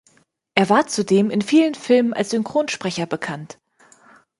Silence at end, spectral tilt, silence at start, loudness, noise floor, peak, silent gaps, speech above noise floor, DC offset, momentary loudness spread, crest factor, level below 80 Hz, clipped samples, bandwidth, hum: 0.95 s; -5 dB/octave; 0.55 s; -19 LUFS; -59 dBFS; -2 dBFS; none; 41 dB; under 0.1%; 10 LU; 18 dB; -66 dBFS; under 0.1%; 11.5 kHz; none